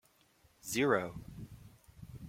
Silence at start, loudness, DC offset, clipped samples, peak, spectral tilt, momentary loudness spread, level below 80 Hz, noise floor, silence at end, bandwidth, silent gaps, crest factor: 0.65 s; -34 LUFS; under 0.1%; under 0.1%; -14 dBFS; -4.5 dB/octave; 24 LU; -62 dBFS; -68 dBFS; 0 s; 16.5 kHz; none; 24 dB